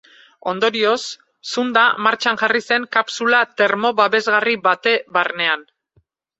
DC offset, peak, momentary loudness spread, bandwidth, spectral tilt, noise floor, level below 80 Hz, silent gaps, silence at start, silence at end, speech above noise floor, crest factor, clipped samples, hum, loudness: under 0.1%; -2 dBFS; 9 LU; 8.2 kHz; -2.5 dB/octave; -62 dBFS; -68 dBFS; none; 0.45 s; 0.75 s; 44 dB; 18 dB; under 0.1%; none; -17 LUFS